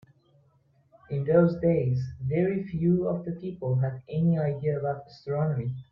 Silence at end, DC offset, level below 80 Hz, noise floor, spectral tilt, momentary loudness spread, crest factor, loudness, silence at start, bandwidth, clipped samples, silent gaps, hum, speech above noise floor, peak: 0.1 s; under 0.1%; -58 dBFS; -65 dBFS; -11 dB/octave; 10 LU; 20 dB; -27 LUFS; 1.1 s; 5.8 kHz; under 0.1%; none; none; 38 dB; -8 dBFS